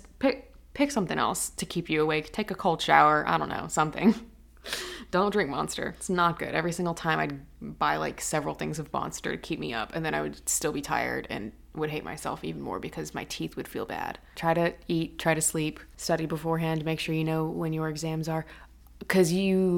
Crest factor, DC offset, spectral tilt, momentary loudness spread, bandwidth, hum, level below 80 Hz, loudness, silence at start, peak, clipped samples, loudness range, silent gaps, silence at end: 24 dB; under 0.1%; -4.5 dB/octave; 11 LU; 18 kHz; none; -52 dBFS; -29 LUFS; 0.05 s; -4 dBFS; under 0.1%; 6 LU; none; 0 s